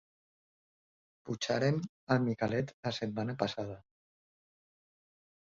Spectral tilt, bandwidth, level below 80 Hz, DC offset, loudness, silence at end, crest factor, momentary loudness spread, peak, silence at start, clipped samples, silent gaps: -5.5 dB/octave; 7.4 kHz; -68 dBFS; under 0.1%; -34 LUFS; 1.6 s; 22 dB; 12 LU; -14 dBFS; 1.25 s; under 0.1%; 1.89-2.07 s, 2.74-2.83 s